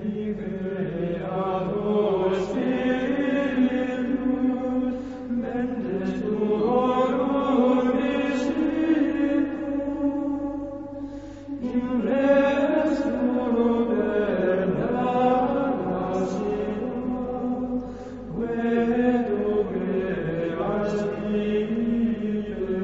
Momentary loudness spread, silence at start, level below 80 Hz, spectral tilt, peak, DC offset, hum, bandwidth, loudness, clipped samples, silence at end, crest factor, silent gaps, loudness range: 8 LU; 0 s; -50 dBFS; -7.5 dB/octave; -8 dBFS; 0.1%; none; 7.8 kHz; -25 LUFS; under 0.1%; 0 s; 16 dB; none; 4 LU